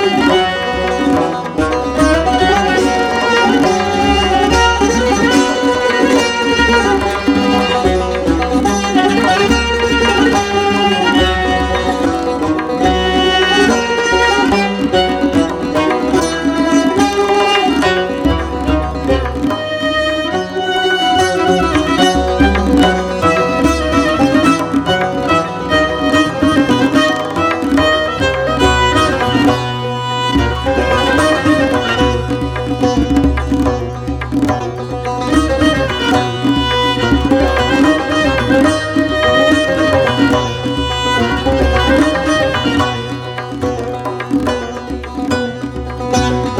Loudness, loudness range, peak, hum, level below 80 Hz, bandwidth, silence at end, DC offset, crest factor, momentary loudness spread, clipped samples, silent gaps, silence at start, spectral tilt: -13 LUFS; 3 LU; -2 dBFS; none; -26 dBFS; 15 kHz; 0 s; under 0.1%; 12 dB; 6 LU; under 0.1%; none; 0 s; -5 dB/octave